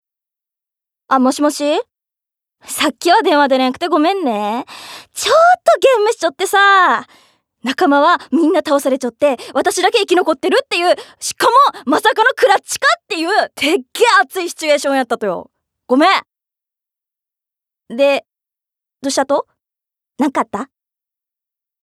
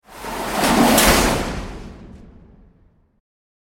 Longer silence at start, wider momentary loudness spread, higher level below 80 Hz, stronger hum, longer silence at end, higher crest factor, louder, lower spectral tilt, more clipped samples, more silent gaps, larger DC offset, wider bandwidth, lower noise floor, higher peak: first, 1.1 s vs 0.1 s; second, 10 LU vs 22 LU; second, -68 dBFS vs -32 dBFS; neither; second, 1.2 s vs 1.5 s; about the same, 16 dB vs 20 dB; about the same, -14 LUFS vs -16 LUFS; about the same, -2 dB/octave vs -3 dB/octave; neither; neither; neither; about the same, 16 kHz vs 17 kHz; first, -84 dBFS vs -56 dBFS; about the same, 0 dBFS vs 0 dBFS